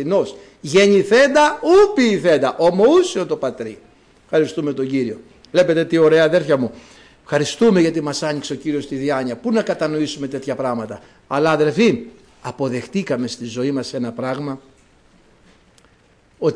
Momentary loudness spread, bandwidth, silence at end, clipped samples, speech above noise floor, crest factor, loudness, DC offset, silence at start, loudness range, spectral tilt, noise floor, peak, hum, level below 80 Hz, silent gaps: 14 LU; 10.5 kHz; 0 s; under 0.1%; 37 dB; 14 dB; -18 LUFS; under 0.1%; 0 s; 10 LU; -5.5 dB/octave; -54 dBFS; -4 dBFS; none; -56 dBFS; none